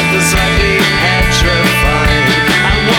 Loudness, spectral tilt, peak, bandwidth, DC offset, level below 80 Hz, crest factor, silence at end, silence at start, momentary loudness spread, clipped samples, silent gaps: -10 LUFS; -4 dB/octave; 0 dBFS; over 20 kHz; under 0.1%; -20 dBFS; 10 dB; 0 s; 0 s; 1 LU; under 0.1%; none